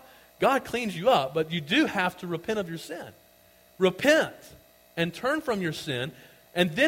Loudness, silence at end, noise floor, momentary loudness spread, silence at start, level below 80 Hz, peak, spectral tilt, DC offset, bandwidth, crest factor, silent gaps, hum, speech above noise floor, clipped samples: -27 LUFS; 0 s; -58 dBFS; 13 LU; 0.4 s; -62 dBFS; -8 dBFS; -4.5 dB/octave; under 0.1%; 16.5 kHz; 20 dB; none; none; 32 dB; under 0.1%